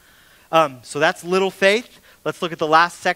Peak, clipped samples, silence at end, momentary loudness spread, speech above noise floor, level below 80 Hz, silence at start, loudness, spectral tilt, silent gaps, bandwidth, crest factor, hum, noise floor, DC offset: 0 dBFS; under 0.1%; 0 s; 10 LU; 32 dB; -64 dBFS; 0.5 s; -19 LUFS; -4 dB/octave; none; 16 kHz; 20 dB; none; -51 dBFS; under 0.1%